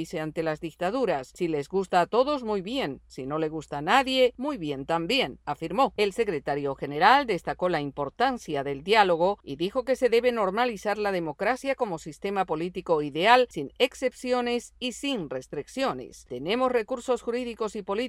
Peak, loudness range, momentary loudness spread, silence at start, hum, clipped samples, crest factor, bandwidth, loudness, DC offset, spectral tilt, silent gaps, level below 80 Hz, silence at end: -6 dBFS; 4 LU; 11 LU; 0 s; none; under 0.1%; 22 dB; 14.5 kHz; -27 LUFS; under 0.1%; -4.5 dB/octave; none; -58 dBFS; 0 s